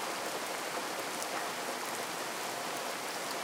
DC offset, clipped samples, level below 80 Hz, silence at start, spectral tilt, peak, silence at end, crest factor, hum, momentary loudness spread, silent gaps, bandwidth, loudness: under 0.1%; under 0.1%; -88 dBFS; 0 s; -1 dB/octave; -14 dBFS; 0 s; 24 dB; none; 1 LU; none; 17.5 kHz; -36 LUFS